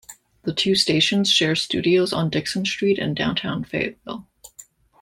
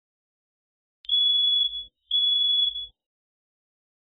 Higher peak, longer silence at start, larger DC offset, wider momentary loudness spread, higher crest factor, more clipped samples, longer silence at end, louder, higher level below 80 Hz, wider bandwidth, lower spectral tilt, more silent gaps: first, -4 dBFS vs -16 dBFS; second, 0.1 s vs 1.1 s; neither; second, 11 LU vs 17 LU; first, 18 dB vs 12 dB; neither; second, 0.4 s vs 1.15 s; about the same, -20 LUFS vs -21 LUFS; first, -56 dBFS vs -62 dBFS; first, 16 kHz vs 4.3 kHz; first, -4 dB/octave vs 3.5 dB/octave; neither